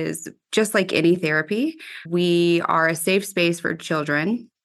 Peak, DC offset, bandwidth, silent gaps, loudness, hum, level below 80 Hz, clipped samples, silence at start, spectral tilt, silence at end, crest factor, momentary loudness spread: -6 dBFS; under 0.1%; 12.5 kHz; none; -21 LUFS; none; -70 dBFS; under 0.1%; 0 s; -4.5 dB/octave; 0.2 s; 16 dB; 8 LU